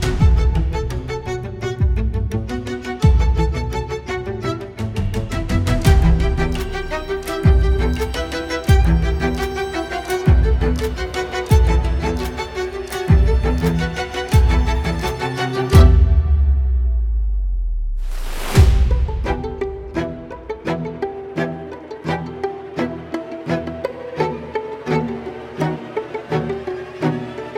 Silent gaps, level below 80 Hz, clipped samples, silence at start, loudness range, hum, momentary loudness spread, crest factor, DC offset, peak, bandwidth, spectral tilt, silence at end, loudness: none; -20 dBFS; under 0.1%; 0 s; 9 LU; none; 12 LU; 16 dB; under 0.1%; -2 dBFS; 15 kHz; -6.5 dB/octave; 0 s; -20 LUFS